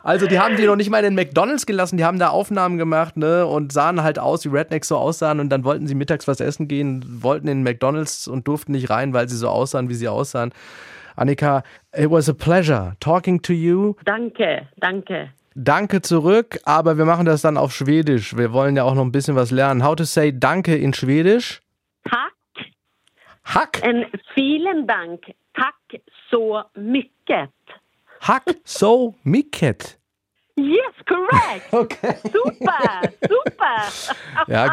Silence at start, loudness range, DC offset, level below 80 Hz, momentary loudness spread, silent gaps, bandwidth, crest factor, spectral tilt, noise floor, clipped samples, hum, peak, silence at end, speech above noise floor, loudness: 0.05 s; 5 LU; under 0.1%; -58 dBFS; 8 LU; none; 15.5 kHz; 18 dB; -6 dB/octave; -72 dBFS; under 0.1%; none; -2 dBFS; 0 s; 54 dB; -19 LUFS